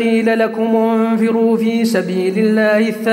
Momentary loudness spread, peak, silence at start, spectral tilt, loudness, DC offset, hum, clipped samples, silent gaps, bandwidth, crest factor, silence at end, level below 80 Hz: 3 LU; -2 dBFS; 0 s; -6 dB/octave; -15 LUFS; under 0.1%; none; under 0.1%; none; 15.5 kHz; 12 dB; 0 s; -66 dBFS